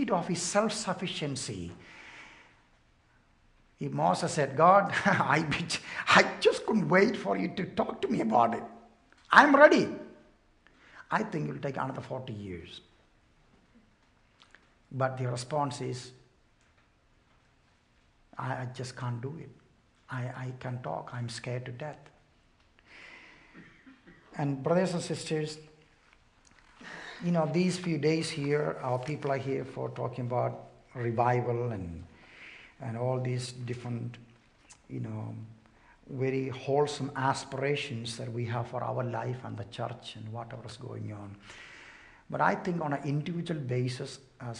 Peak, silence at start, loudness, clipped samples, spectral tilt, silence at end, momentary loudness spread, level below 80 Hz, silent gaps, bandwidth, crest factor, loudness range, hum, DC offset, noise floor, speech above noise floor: -4 dBFS; 0 s; -30 LUFS; under 0.1%; -5.5 dB/octave; 0 s; 22 LU; -66 dBFS; none; 11 kHz; 28 dB; 15 LU; none; under 0.1%; -66 dBFS; 36 dB